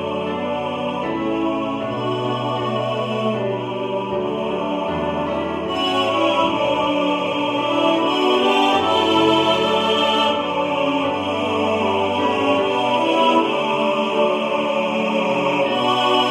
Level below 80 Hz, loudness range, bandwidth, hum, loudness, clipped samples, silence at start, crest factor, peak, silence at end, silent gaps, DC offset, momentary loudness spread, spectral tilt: -54 dBFS; 6 LU; 13 kHz; none; -19 LUFS; under 0.1%; 0 s; 16 dB; -4 dBFS; 0 s; none; under 0.1%; 7 LU; -5 dB/octave